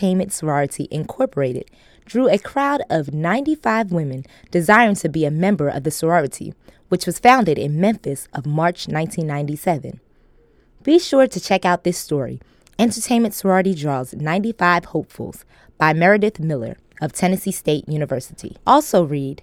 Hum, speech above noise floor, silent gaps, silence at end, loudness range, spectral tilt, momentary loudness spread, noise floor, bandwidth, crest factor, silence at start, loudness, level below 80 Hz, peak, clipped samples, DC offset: none; 35 dB; none; 0.1 s; 3 LU; -5.5 dB/octave; 13 LU; -53 dBFS; 17 kHz; 18 dB; 0 s; -19 LUFS; -52 dBFS; 0 dBFS; under 0.1%; under 0.1%